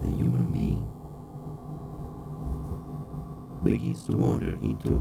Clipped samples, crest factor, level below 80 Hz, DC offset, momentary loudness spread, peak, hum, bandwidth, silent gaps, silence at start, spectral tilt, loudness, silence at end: under 0.1%; 20 dB; -40 dBFS; under 0.1%; 14 LU; -10 dBFS; none; 15 kHz; none; 0 s; -9 dB/octave; -30 LUFS; 0 s